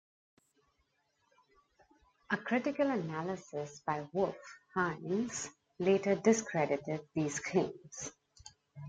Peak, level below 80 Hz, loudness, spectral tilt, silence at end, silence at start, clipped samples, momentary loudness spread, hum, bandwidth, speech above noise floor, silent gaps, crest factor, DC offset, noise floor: -14 dBFS; -72 dBFS; -35 LUFS; -5 dB/octave; 0 s; 2.3 s; under 0.1%; 14 LU; none; 9.4 kHz; 44 dB; none; 22 dB; under 0.1%; -78 dBFS